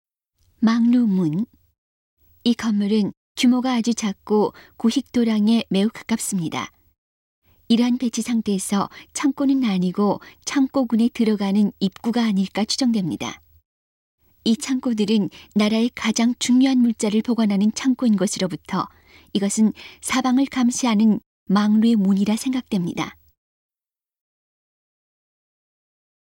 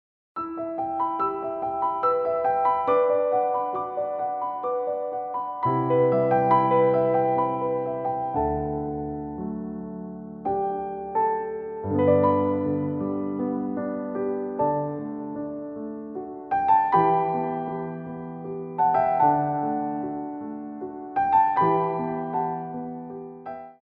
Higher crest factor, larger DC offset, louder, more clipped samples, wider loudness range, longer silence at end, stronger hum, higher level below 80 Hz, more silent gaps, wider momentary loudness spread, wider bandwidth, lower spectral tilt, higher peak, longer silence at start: about the same, 14 dB vs 18 dB; neither; first, -21 LUFS vs -25 LUFS; neither; about the same, 4 LU vs 6 LU; first, 3.15 s vs 0.1 s; neither; second, -60 dBFS vs -54 dBFS; first, 1.78-2.17 s, 3.17-3.35 s, 6.98-7.42 s, 13.65-14.18 s, 21.26-21.46 s vs none; second, 9 LU vs 14 LU; first, 16.5 kHz vs 4.3 kHz; second, -5 dB/octave vs -11 dB/octave; about the same, -6 dBFS vs -8 dBFS; first, 0.6 s vs 0.35 s